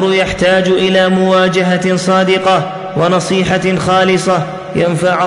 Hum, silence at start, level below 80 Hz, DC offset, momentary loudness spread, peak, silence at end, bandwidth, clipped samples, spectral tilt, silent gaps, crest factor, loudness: none; 0 s; -42 dBFS; under 0.1%; 5 LU; -2 dBFS; 0 s; 11 kHz; under 0.1%; -5 dB/octave; none; 10 dB; -12 LUFS